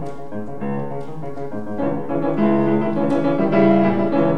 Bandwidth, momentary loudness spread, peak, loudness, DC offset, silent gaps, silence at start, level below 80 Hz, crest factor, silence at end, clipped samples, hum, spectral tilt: 6.4 kHz; 15 LU; -4 dBFS; -19 LUFS; 4%; none; 0 s; -52 dBFS; 16 dB; 0 s; under 0.1%; none; -9.5 dB/octave